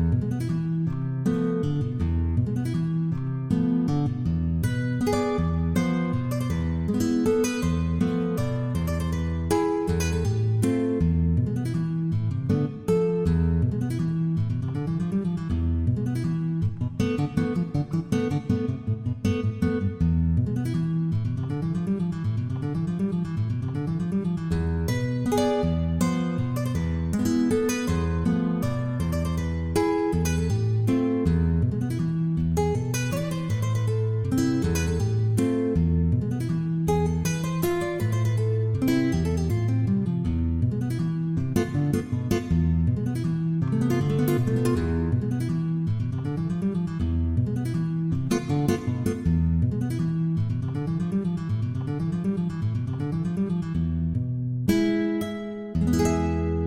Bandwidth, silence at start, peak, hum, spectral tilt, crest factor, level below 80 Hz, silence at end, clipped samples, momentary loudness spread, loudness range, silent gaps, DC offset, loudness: 16 kHz; 0 s; -8 dBFS; none; -7.5 dB/octave; 16 dB; -40 dBFS; 0 s; under 0.1%; 4 LU; 2 LU; none; under 0.1%; -26 LUFS